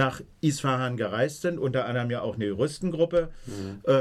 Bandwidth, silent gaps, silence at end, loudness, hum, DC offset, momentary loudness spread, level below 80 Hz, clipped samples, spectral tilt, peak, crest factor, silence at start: 13.5 kHz; none; 0 s; -28 LUFS; none; under 0.1%; 6 LU; -52 dBFS; under 0.1%; -6 dB/octave; -12 dBFS; 14 dB; 0 s